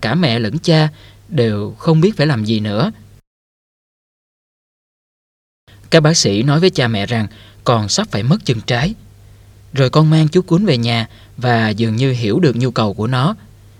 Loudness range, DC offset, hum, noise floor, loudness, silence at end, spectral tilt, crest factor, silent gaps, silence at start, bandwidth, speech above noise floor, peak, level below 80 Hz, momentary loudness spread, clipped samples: 5 LU; under 0.1%; none; -42 dBFS; -15 LUFS; 0.45 s; -5.5 dB/octave; 16 dB; 3.27-5.67 s; 0 s; 11.5 kHz; 28 dB; 0 dBFS; -46 dBFS; 9 LU; under 0.1%